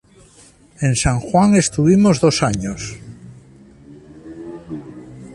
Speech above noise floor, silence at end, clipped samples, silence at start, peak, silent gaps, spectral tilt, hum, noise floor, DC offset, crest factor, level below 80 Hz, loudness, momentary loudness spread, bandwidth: 33 dB; 0 s; under 0.1%; 0.8 s; -2 dBFS; none; -5.5 dB/octave; none; -48 dBFS; under 0.1%; 16 dB; -38 dBFS; -16 LUFS; 24 LU; 11.5 kHz